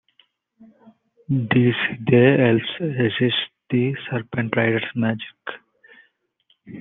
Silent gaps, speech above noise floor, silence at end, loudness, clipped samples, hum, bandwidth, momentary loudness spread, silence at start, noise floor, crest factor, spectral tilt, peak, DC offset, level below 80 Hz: none; 45 dB; 0 s; -20 LUFS; under 0.1%; none; 4 kHz; 16 LU; 0.6 s; -65 dBFS; 20 dB; -10 dB/octave; -2 dBFS; under 0.1%; -62 dBFS